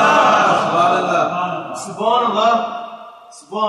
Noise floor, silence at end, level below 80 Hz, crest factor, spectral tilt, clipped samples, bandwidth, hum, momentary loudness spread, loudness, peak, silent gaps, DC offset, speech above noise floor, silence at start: -36 dBFS; 0 s; -66 dBFS; 14 dB; -4 dB/octave; under 0.1%; 12 kHz; none; 17 LU; -16 LUFS; -2 dBFS; none; under 0.1%; 19 dB; 0 s